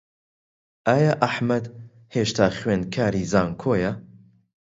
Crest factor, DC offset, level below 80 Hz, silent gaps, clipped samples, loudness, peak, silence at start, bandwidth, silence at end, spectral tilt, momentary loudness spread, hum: 24 dB; under 0.1%; -50 dBFS; none; under 0.1%; -23 LUFS; 0 dBFS; 0.85 s; 8 kHz; 0.7 s; -6 dB/octave; 9 LU; none